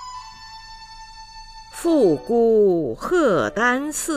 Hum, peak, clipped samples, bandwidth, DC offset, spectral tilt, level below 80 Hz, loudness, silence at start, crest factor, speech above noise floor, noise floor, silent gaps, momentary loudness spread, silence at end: 50 Hz at -55 dBFS; -6 dBFS; under 0.1%; 15.5 kHz; under 0.1%; -4.5 dB/octave; -48 dBFS; -19 LUFS; 0 s; 14 dB; 22 dB; -40 dBFS; none; 22 LU; 0 s